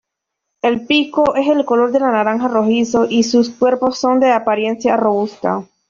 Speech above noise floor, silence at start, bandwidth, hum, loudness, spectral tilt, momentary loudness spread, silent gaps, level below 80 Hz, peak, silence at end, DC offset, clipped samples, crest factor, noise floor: 63 dB; 0.65 s; 7.4 kHz; none; -15 LUFS; -4.5 dB/octave; 5 LU; none; -56 dBFS; -2 dBFS; 0.25 s; under 0.1%; under 0.1%; 14 dB; -78 dBFS